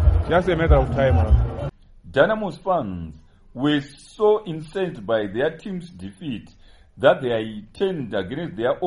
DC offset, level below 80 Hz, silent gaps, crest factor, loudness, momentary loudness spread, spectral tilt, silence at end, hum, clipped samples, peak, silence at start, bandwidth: under 0.1%; -28 dBFS; none; 20 dB; -22 LUFS; 15 LU; -8 dB/octave; 0 s; none; under 0.1%; -2 dBFS; 0 s; 11 kHz